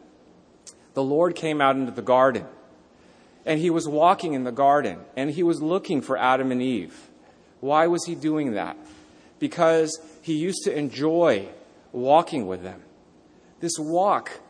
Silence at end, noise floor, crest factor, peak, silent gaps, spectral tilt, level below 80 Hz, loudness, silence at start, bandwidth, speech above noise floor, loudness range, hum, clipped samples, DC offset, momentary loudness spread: 0.1 s; -54 dBFS; 20 dB; -4 dBFS; none; -5 dB/octave; -68 dBFS; -23 LUFS; 0.65 s; 10.5 kHz; 32 dB; 3 LU; none; under 0.1%; under 0.1%; 13 LU